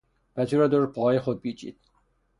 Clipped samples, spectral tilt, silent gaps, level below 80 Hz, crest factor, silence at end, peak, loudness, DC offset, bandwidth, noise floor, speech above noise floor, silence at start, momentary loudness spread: under 0.1%; -8 dB/octave; none; -62 dBFS; 16 dB; 0.7 s; -10 dBFS; -25 LUFS; under 0.1%; 11.5 kHz; -68 dBFS; 44 dB; 0.35 s; 18 LU